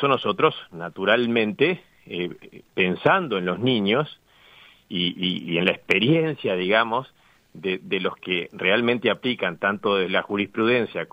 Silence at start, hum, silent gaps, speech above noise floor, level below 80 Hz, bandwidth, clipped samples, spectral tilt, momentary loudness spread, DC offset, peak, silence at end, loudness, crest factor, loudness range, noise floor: 0 s; none; none; 29 dB; -66 dBFS; 16 kHz; under 0.1%; -7 dB/octave; 11 LU; under 0.1%; -2 dBFS; 0.1 s; -23 LUFS; 20 dB; 1 LU; -52 dBFS